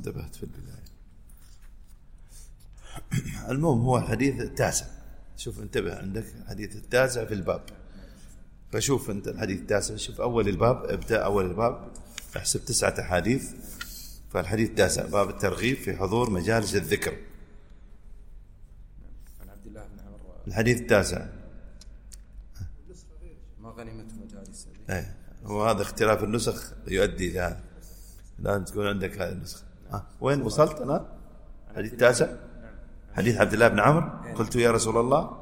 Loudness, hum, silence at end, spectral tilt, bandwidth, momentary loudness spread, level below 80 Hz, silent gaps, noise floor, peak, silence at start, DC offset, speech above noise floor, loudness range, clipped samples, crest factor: -26 LUFS; none; 0 s; -5 dB/octave; 16.5 kHz; 22 LU; -44 dBFS; none; -48 dBFS; -4 dBFS; 0 s; under 0.1%; 22 dB; 9 LU; under 0.1%; 24 dB